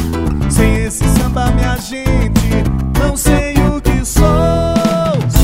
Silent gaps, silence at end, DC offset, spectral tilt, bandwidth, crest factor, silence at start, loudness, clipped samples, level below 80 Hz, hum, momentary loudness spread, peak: none; 0 s; under 0.1%; -6 dB/octave; 16.5 kHz; 12 dB; 0 s; -14 LUFS; 0.2%; -16 dBFS; none; 4 LU; 0 dBFS